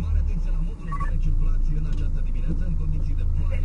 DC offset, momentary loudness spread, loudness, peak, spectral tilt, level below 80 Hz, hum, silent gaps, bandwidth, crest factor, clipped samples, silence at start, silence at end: under 0.1%; 4 LU; -29 LUFS; -12 dBFS; -8.5 dB/octave; -22 dBFS; none; none; 3 kHz; 10 dB; under 0.1%; 0 s; 0 s